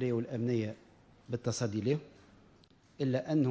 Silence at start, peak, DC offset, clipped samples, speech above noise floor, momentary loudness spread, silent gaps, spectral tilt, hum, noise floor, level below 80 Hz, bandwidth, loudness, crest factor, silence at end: 0 s; -18 dBFS; under 0.1%; under 0.1%; 31 dB; 9 LU; none; -6.5 dB/octave; none; -63 dBFS; -66 dBFS; 8 kHz; -34 LUFS; 16 dB; 0 s